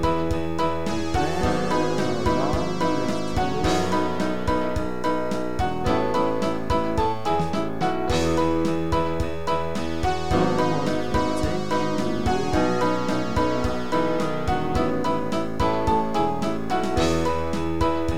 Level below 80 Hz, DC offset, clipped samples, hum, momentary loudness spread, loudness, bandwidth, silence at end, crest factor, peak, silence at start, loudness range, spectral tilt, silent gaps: -38 dBFS; 4%; under 0.1%; none; 4 LU; -24 LUFS; 16.5 kHz; 0 s; 16 dB; -8 dBFS; 0 s; 1 LU; -6 dB/octave; none